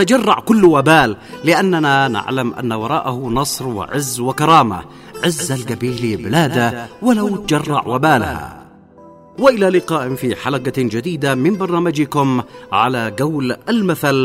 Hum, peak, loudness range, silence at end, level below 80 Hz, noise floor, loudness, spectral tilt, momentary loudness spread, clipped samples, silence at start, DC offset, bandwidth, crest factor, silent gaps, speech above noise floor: none; 0 dBFS; 3 LU; 0 s; -46 dBFS; -42 dBFS; -16 LUFS; -5 dB/octave; 9 LU; under 0.1%; 0 s; under 0.1%; 16 kHz; 16 dB; none; 26 dB